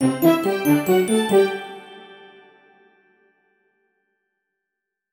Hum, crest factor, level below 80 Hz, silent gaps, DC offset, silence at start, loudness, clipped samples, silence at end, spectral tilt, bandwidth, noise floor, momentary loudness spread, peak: none; 20 dB; -66 dBFS; none; under 0.1%; 0 s; -19 LUFS; under 0.1%; 3 s; -5.5 dB/octave; 18 kHz; -83 dBFS; 22 LU; -2 dBFS